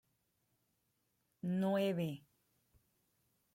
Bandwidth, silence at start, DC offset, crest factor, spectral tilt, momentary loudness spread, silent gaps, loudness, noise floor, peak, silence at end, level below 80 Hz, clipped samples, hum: 16.5 kHz; 1.45 s; under 0.1%; 18 dB; -7.5 dB/octave; 11 LU; none; -38 LUFS; -82 dBFS; -26 dBFS; 1.35 s; -82 dBFS; under 0.1%; none